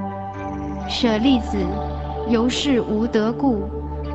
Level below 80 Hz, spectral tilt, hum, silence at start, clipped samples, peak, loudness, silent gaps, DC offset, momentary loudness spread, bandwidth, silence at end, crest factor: -32 dBFS; -6 dB/octave; none; 0 s; under 0.1%; -6 dBFS; -21 LUFS; none; under 0.1%; 11 LU; 8.4 kHz; 0 s; 14 dB